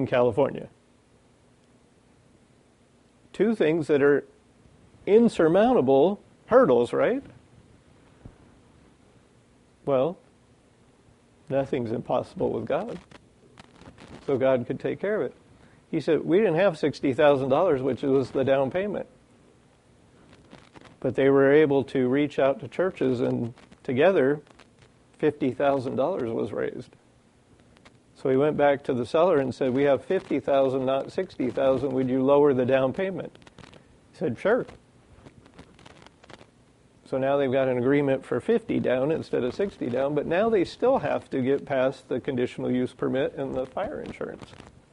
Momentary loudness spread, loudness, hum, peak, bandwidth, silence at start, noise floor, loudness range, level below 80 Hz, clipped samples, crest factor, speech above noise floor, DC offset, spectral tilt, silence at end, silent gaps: 12 LU; -24 LUFS; none; -6 dBFS; 10.5 kHz; 0 s; -60 dBFS; 9 LU; -60 dBFS; under 0.1%; 20 dB; 36 dB; under 0.1%; -7.5 dB/octave; 0.5 s; none